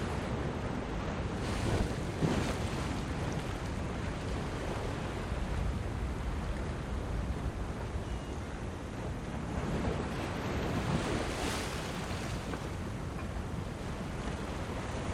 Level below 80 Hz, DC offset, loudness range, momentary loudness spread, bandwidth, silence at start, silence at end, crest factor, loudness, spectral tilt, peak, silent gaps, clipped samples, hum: -42 dBFS; under 0.1%; 3 LU; 6 LU; 15.5 kHz; 0 s; 0 s; 20 dB; -37 LUFS; -6 dB/octave; -16 dBFS; none; under 0.1%; none